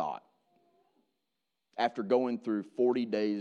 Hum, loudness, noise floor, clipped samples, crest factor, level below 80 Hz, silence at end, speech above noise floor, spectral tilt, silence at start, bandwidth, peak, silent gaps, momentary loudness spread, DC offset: none; -31 LUFS; -86 dBFS; under 0.1%; 18 dB; -84 dBFS; 0 s; 55 dB; -7 dB/octave; 0 s; 7.2 kHz; -14 dBFS; none; 11 LU; under 0.1%